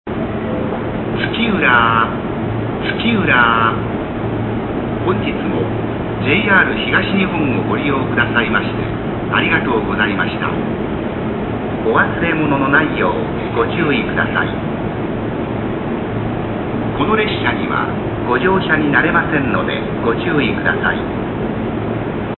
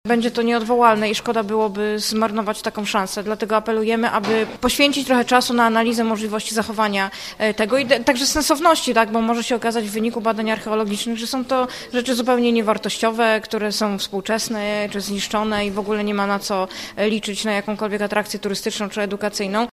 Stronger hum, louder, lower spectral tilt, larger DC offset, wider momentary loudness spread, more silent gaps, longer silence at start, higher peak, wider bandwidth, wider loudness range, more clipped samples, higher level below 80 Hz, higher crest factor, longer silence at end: neither; first, -16 LUFS vs -20 LUFS; first, -11 dB/octave vs -3.5 dB/octave; neither; about the same, 9 LU vs 7 LU; neither; about the same, 0.05 s vs 0.05 s; about the same, 0 dBFS vs 0 dBFS; second, 4.3 kHz vs 15.5 kHz; about the same, 4 LU vs 4 LU; neither; first, -34 dBFS vs -50 dBFS; about the same, 16 dB vs 20 dB; about the same, 0 s vs 0.05 s